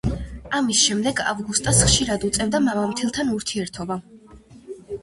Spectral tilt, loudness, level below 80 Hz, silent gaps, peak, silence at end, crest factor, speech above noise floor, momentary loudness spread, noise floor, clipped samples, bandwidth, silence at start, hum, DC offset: -3 dB/octave; -21 LUFS; -38 dBFS; none; -4 dBFS; 0.05 s; 20 dB; 25 dB; 15 LU; -46 dBFS; under 0.1%; 12 kHz; 0.05 s; none; under 0.1%